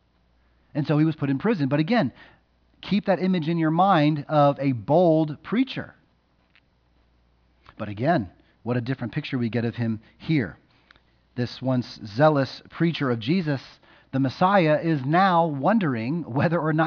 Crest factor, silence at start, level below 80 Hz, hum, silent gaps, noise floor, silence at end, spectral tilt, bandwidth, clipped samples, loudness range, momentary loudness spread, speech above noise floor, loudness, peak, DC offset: 18 dB; 0.75 s; -62 dBFS; none; none; -64 dBFS; 0 s; -8.5 dB/octave; 5.4 kHz; under 0.1%; 7 LU; 12 LU; 42 dB; -23 LUFS; -6 dBFS; under 0.1%